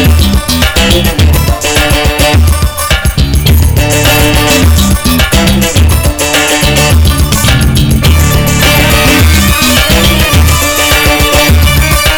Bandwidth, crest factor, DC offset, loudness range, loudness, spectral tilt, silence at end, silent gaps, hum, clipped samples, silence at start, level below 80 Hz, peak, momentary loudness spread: over 20 kHz; 6 dB; under 0.1%; 2 LU; -7 LUFS; -4 dB/octave; 0 s; none; none; under 0.1%; 0 s; -12 dBFS; 0 dBFS; 3 LU